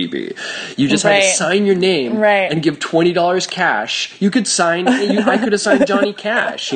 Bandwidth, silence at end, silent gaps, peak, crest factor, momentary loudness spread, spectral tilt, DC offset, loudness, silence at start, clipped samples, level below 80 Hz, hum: 9.8 kHz; 0 s; none; 0 dBFS; 14 dB; 6 LU; -3.5 dB/octave; under 0.1%; -15 LUFS; 0 s; under 0.1%; -60 dBFS; none